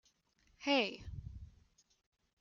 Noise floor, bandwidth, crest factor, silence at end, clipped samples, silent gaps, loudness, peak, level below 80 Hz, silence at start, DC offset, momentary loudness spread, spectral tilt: -74 dBFS; 7.2 kHz; 22 dB; 0.9 s; under 0.1%; none; -35 LUFS; -20 dBFS; -58 dBFS; 0.6 s; under 0.1%; 20 LU; -4.5 dB/octave